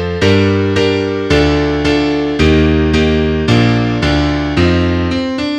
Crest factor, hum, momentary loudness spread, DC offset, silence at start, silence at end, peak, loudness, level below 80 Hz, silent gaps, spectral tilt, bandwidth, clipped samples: 12 dB; none; 4 LU; under 0.1%; 0 s; 0 s; 0 dBFS; -13 LUFS; -24 dBFS; none; -6.5 dB/octave; 9.8 kHz; under 0.1%